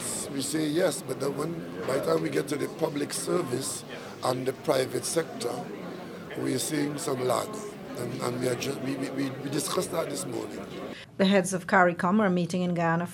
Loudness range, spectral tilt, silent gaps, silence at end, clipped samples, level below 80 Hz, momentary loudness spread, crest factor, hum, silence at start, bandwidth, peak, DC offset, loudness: 5 LU; -4.5 dB/octave; none; 0 s; under 0.1%; -66 dBFS; 13 LU; 22 dB; none; 0 s; 18.5 kHz; -6 dBFS; under 0.1%; -29 LUFS